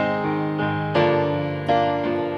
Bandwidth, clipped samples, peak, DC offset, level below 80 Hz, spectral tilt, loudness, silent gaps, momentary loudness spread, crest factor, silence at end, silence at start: 7 kHz; under 0.1%; -6 dBFS; under 0.1%; -56 dBFS; -8 dB/octave; -22 LUFS; none; 4 LU; 14 dB; 0 s; 0 s